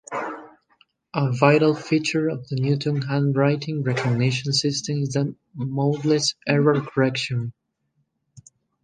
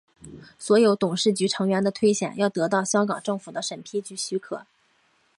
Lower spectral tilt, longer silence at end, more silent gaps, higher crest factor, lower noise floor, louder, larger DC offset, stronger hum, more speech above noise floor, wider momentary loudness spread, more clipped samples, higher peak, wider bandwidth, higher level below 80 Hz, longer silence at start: about the same, -5.5 dB/octave vs -4.5 dB/octave; second, 0.45 s vs 0.75 s; neither; about the same, 22 dB vs 18 dB; first, -72 dBFS vs -65 dBFS; about the same, -22 LUFS vs -24 LUFS; neither; neither; first, 50 dB vs 41 dB; about the same, 10 LU vs 12 LU; neither; first, -2 dBFS vs -8 dBFS; second, 9.6 kHz vs 11.5 kHz; first, -62 dBFS vs -68 dBFS; second, 0.1 s vs 0.25 s